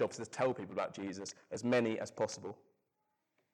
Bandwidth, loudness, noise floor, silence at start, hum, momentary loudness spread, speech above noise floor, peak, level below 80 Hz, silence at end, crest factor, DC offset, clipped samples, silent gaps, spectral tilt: 11.5 kHz; -38 LUFS; -84 dBFS; 0 s; none; 13 LU; 46 dB; -24 dBFS; -80 dBFS; 1 s; 16 dB; under 0.1%; under 0.1%; none; -5 dB/octave